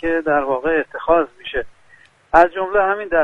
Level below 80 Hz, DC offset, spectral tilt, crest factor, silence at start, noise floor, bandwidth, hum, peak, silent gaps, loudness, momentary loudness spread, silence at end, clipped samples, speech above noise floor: -42 dBFS; under 0.1%; -6 dB/octave; 18 dB; 0.05 s; -51 dBFS; 8.8 kHz; none; 0 dBFS; none; -18 LUFS; 12 LU; 0 s; under 0.1%; 34 dB